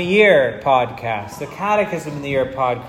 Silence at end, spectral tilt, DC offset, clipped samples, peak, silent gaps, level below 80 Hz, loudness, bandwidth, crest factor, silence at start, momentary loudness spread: 0 s; -5.5 dB/octave; under 0.1%; under 0.1%; -2 dBFS; none; -50 dBFS; -18 LUFS; 15 kHz; 16 dB; 0 s; 13 LU